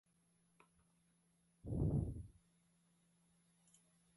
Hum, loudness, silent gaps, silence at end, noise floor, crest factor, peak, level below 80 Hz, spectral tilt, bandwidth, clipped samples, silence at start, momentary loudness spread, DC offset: none; -42 LUFS; none; 1.85 s; -78 dBFS; 20 dB; -28 dBFS; -56 dBFS; -10 dB/octave; 11 kHz; under 0.1%; 1.65 s; 19 LU; under 0.1%